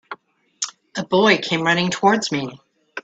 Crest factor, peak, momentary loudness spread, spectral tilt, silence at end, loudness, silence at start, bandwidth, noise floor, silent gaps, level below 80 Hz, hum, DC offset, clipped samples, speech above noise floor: 20 dB; -2 dBFS; 19 LU; -4 dB/octave; 0.05 s; -19 LUFS; 0.1 s; 9 kHz; -43 dBFS; none; -64 dBFS; none; under 0.1%; under 0.1%; 25 dB